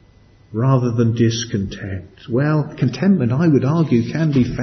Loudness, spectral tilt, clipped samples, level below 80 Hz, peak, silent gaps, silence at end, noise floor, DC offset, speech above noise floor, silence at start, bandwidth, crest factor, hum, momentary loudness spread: -18 LUFS; -7 dB/octave; under 0.1%; -46 dBFS; -4 dBFS; none; 0 s; -49 dBFS; under 0.1%; 32 dB; 0.5 s; 6.4 kHz; 14 dB; none; 11 LU